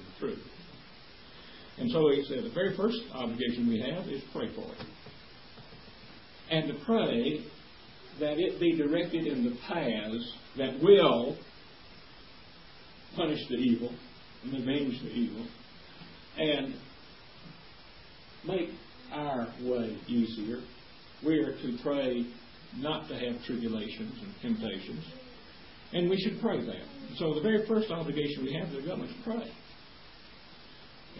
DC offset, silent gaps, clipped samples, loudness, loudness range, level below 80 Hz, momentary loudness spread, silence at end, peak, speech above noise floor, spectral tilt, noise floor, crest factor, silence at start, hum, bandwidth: 0.2%; none; under 0.1%; -32 LUFS; 8 LU; -62 dBFS; 23 LU; 0 s; -10 dBFS; 23 dB; -9.5 dB/octave; -53 dBFS; 24 dB; 0 s; none; 5.8 kHz